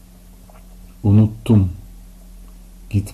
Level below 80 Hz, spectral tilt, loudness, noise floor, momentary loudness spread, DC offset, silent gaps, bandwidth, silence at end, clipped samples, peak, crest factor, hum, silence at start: -40 dBFS; -9 dB/octave; -17 LUFS; -43 dBFS; 9 LU; under 0.1%; none; 13 kHz; 0.05 s; under 0.1%; -4 dBFS; 14 dB; none; 1.05 s